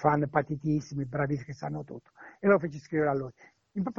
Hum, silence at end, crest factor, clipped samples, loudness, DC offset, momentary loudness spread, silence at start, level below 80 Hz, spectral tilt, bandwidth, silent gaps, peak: none; 0.05 s; 22 dB; under 0.1%; -30 LUFS; under 0.1%; 15 LU; 0 s; -60 dBFS; -8.5 dB/octave; 7.2 kHz; none; -8 dBFS